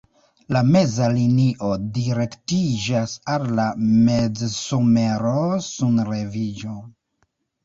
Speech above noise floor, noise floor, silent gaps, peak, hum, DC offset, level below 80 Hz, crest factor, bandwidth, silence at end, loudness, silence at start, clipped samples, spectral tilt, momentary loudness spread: 50 dB; -69 dBFS; none; -6 dBFS; none; under 0.1%; -50 dBFS; 16 dB; 7.8 kHz; 0.75 s; -21 LUFS; 0.5 s; under 0.1%; -6.5 dB/octave; 8 LU